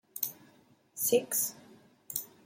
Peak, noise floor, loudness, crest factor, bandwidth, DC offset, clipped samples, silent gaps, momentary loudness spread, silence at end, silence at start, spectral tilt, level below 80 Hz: -14 dBFS; -64 dBFS; -32 LUFS; 22 dB; 16.5 kHz; under 0.1%; under 0.1%; none; 11 LU; 0.2 s; 0.15 s; -2 dB/octave; -84 dBFS